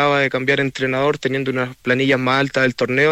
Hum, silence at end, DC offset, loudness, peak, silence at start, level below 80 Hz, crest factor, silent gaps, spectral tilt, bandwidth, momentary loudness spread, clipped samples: none; 0 s; under 0.1%; -18 LUFS; -4 dBFS; 0 s; -56 dBFS; 12 dB; none; -5.5 dB/octave; 14.5 kHz; 5 LU; under 0.1%